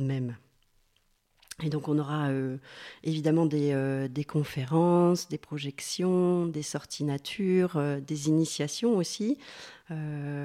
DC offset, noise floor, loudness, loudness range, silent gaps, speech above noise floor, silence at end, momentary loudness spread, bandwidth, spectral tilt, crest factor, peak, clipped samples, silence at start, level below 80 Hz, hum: under 0.1%; -70 dBFS; -29 LUFS; 3 LU; none; 41 dB; 0 s; 12 LU; 15 kHz; -6 dB/octave; 14 dB; -14 dBFS; under 0.1%; 0 s; -68 dBFS; none